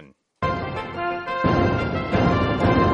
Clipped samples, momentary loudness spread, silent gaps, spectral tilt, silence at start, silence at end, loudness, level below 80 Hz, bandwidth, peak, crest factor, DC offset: under 0.1%; 8 LU; none; -8 dB/octave; 0 s; 0 s; -22 LUFS; -36 dBFS; 8.2 kHz; -6 dBFS; 16 dB; under 0.1%